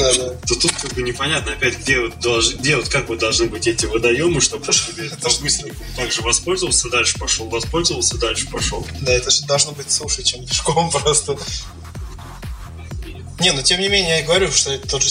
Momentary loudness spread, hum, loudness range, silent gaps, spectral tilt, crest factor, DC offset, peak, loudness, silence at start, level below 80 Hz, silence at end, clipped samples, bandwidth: 15 LU; none; 3 LU; none; -2 dB/octave; 18 dB; under 0.1%; -2 dBFS; -17 LUFS; 0 s; -34 dBFS; 0 s; under 0.1%; 16 kHz